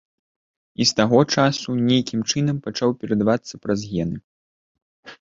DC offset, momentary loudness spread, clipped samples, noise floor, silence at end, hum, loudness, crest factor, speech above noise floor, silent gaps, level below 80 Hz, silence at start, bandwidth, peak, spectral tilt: under 0.1%; 9 LU; under 0.1%; under -90 dBFS; 0.05 s; none; -21 LUFS; 20 dB; over 70 dB; 4.24-4.75 s, 4.82-5.03 s; -54 dBFS; 0.8 s; 7.8 kHz; -2 dBFS; -5 dB/octave